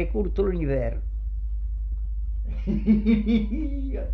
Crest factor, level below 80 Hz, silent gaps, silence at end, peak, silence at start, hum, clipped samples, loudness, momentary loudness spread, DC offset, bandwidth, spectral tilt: 14 dB; -28 dBFS; none; 0 s; -10 dBFS; 0 s; 50 Hz at -30 dBFS; under 0.1%; -26 LUFS; 11 LU; under 0.1%; 4.7 kHz; -10.5 dB/octave